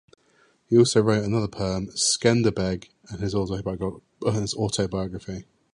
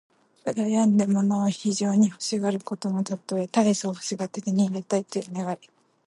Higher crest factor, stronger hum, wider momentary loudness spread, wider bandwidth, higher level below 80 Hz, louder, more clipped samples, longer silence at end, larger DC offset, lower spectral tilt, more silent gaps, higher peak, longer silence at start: about the same, 20 dB vs 16 dB; neither; first, 13 LU vs 10 LU; about the same, 11.5 kHz vs 11.5 kHz; first, -48 dBFS vs -74 dBFS; about the same, -24 LUFS vs -25 LUFS; neither; second, 0.35 s vs 0.5 s; neither; about the same, -5 dB/octave vs -5.5 dB/octave; neither; first, -4 dBFS vs -8 dBFS; first, 0.7 s vs 0.45 s